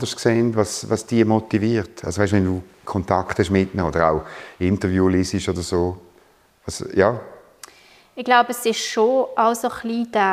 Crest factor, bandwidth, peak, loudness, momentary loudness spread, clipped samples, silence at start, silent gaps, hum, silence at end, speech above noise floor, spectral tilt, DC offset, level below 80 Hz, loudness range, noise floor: 18 dB; 15.5 kHz; -2 dBFS; -20 LUFS; 10 LU; under 0.1%; 0 s; none; none; 0 s; 35 dB; -5.5 dB/octave; under 0.1%; -46 dBFS; 2 LU; -55 dBFS